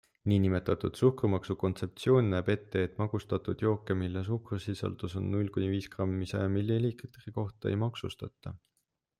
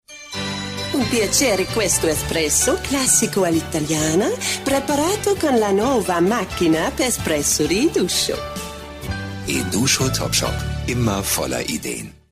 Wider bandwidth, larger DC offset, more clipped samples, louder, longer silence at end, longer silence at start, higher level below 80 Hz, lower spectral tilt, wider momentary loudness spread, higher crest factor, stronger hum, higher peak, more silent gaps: second, 12 kHz vs 15.5 kHz; neither; neither; second, -32 LUFS vs -19 LUFS; first, 0.6 s vs 0.2 s; first, 0.25 s vs 0.1 s; second, -62 dBFS vs -38 dBFS; first, -8 dB/octave vs -3.5 dB/octave; about the same, 11 LU vs 10 LU; about the same, 18 dB vs 16 dB; neither; second, -12 dBFS vs -4 dBFS; neither